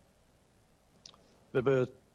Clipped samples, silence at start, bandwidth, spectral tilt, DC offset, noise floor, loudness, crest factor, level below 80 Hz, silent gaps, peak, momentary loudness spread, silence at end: under 0.1%; 1.55 s; 7.6 kHz; -7.5 dB/octave; under 0.1%; -67 dBFS; -32 LUFS; 18 dB; -68 dBFS; none; -18 dBFS; 26 LU; 0.25 s